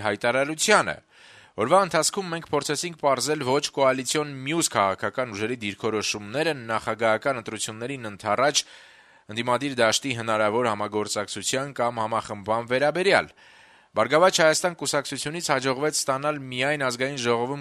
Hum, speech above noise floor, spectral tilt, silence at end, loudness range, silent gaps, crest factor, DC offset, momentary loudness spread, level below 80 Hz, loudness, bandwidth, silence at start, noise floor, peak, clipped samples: none; 27 dB; -3 dB/octave; 0 s; 3 LU; none; 22 dB; under 0.1%; 10 LU; -66 dBFS; -24 LUFS; 13.5 kHz; 0 s; -52 dBFS; -4 dBFS; under 0.1%